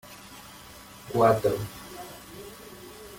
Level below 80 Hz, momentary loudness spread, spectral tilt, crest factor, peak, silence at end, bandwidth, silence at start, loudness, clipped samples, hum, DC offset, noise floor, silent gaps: -56 dBFS; 23 LU; -5.5 dB/octave; 22 dB; -8 dBFS; 0 s; 17 kHz; 0.05 s; -25 LUFS; under 0.1%; none; under 0.1%; -47 dBFS; none